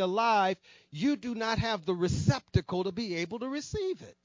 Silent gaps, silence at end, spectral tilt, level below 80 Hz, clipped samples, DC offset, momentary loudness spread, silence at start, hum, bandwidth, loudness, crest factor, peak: none; 0.15 s; -6 dB/octave; -48 dBFS; under 0.1%; under 0.1%; 9 LU; 0 s; none; 7.6 kHz; -31 LUFS; 18 dB; -12 dBFS